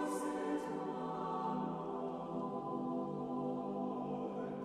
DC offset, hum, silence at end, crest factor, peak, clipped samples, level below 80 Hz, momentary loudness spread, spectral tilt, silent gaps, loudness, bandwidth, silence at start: under 0.1%; none; 0 s; 12 dB; -28 dBFS; under 0.1%; -74 dBFS; 3 LU; -7 dB/octave; none; -41 LUFS; 13 kHz; 0 s